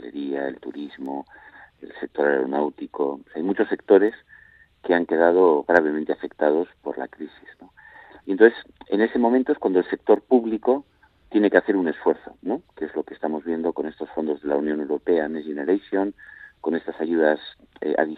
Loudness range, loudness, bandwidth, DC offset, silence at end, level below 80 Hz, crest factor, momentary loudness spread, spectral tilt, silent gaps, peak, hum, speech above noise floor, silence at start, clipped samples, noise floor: 6 LU; -23 LUFS; 4.6 kHz; under 0.1%; 0 s; -64 dBFS; 22 dB; 15 LU; -8 dB/octave; none; 0 dBFS; none; 30 dB; 0 s; under 0.1%; -52 dBFS